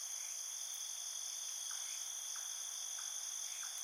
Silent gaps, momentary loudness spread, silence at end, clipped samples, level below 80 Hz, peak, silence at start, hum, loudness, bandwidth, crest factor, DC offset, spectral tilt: none; 1 LU; 0 s; under 0.1%; under -90 dBFS; -32 dBFS; 0 s; none; -41 LUFS; 16.5 kHz; 14 dB; under 0.1%; 7.5 dB/octave